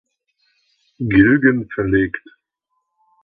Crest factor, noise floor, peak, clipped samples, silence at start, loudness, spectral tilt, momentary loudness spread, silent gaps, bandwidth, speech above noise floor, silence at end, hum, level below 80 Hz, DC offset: 18 dB; -73 dBFS; 0 dBFS; under 0.1%; 1 s; -16 LUFS; -10.5 dB/octave; 13 LU; none; 4.5 kHz; 58 dB; 1.05 s; none; -42 dBFS; under 0.1%